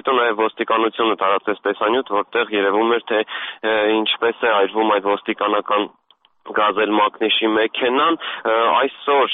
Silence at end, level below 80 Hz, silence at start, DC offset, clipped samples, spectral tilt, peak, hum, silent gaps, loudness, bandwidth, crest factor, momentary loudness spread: 0 s; -64 dBFS; 0.05 s; under 0.1%; under 0.1%; 0 dB/octave; -6 dBFS; none; none; -18 LUFS; 4 kHz; 12 dB; 4 LU